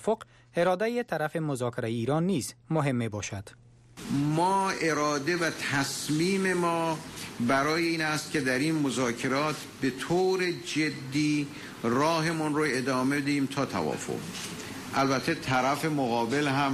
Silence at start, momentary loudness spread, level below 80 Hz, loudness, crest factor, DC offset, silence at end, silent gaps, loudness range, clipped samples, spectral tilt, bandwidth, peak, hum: 0 s; 8 LU; -62 dBFS; -28 LUFS; 12 dB; under 0.1%; 0 s; none; 2 LU; under 0.1%; -5 dB/octave; 15 kHz; -16 dBFS; none